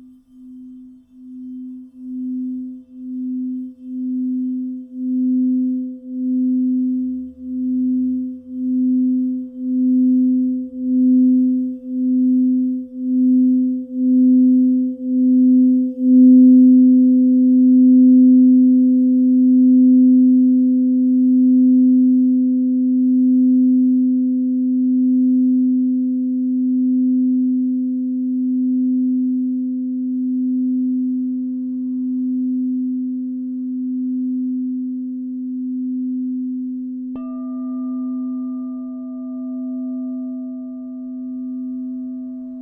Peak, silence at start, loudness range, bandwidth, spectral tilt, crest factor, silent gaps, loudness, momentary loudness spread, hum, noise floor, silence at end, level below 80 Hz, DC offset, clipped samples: -4 dBFS; 0.4 s; 14 LU; 1.3 kHz; -13 dB/octave; 12 dB; none; -16 LUFS; 16 LU; none; -42 dBFS; 0 s; -66 dBFS; under 0.1%; under 0.1%